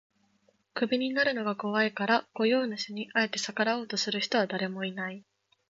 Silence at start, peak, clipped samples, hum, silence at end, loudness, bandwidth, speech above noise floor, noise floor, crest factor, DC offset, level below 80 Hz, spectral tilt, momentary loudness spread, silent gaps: 0.75 s; -12 dBFS; under 0.1%; none; 0.5 s; -29 LUFS; 7.8 kHz; 40 dB; -70 dBFS; 20 dB; under 0.1%; -78 dBFS; -4 dB/octave; 8 LU; none